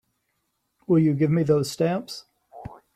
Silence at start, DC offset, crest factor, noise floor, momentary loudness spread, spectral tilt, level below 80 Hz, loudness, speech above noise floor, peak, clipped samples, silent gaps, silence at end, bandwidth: 0.9 s; under 0.1%; 16 dB; -75 dBFS; 22 LU; -7 dB/octave; -60 dBFS; -22 LUFS; 53 dB; -8 dBFS; under 0.1%; none; 0.2 s; 14.5 kHz